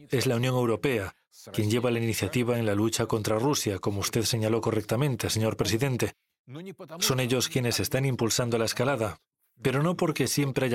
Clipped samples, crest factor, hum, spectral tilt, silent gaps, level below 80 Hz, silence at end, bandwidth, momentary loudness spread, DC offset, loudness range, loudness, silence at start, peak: under 0.1%; 14 dB; none; -4.5 dB/octave; 6.39-6.45 s; -58 dBFS; 0 s; 16.5 kHz; 6 LU; under 0.1%; 1 LU; -27 LUFS; 0 s; -12 dBFS